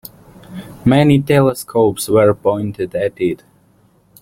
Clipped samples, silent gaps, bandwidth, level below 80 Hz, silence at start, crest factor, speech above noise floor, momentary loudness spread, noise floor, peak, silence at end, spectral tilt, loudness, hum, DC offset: under 0.1%; none; 16.5 kHz; -48 dBFS; 0.5 s; 14 dB; 39 dB; 17 LU; -53 dBFS; -2 dBFS; 0.85 s; -6.5 dB/octave; -15 LUFS; none; under 0.1%